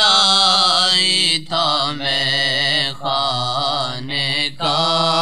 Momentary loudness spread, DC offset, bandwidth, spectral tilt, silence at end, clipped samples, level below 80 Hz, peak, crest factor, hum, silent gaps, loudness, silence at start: 8 LU; 2%; 14 kHz; -2 dB/octave; 0 s; under 0.1%; -58 dBFS; 0 dBFS; 16 dB; none; none; -15 LUFS; 0 s